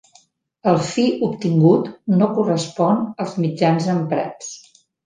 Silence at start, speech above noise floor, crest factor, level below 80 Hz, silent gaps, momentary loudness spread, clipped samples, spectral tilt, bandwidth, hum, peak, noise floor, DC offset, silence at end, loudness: 0.65 s; 38 dB; 16 dB; -62 dBFS; none; 9 LU; under 0.1%; -7 dB/octave; 9.8 kHz; none; -2 dBFS; -56 dBFS; under 0.1%; 0.45 s; -19 LUFS